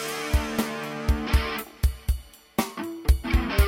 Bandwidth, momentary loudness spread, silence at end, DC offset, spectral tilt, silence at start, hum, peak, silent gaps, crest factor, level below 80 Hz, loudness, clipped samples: 17 kHz; 7 LU; 0 s; under 0.1%; -5.5 dB/octave; 0 s; none; -8 dBFS; none; 18 dB; -26 dBFS; -27 LUFS; under 0.1%